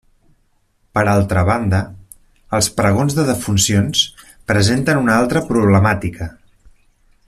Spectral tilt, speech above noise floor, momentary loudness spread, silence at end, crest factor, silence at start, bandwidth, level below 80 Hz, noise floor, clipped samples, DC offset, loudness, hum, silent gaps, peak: -4.5 dB/octave; 45 dB; 9 LU; 0.95 s; 16 dB; 0.95 s; 14 kHz; -42 dBFS; -60 dBFS; under 0.1%; under 0.1%; -16 LUFS; none; none; 0 dBFS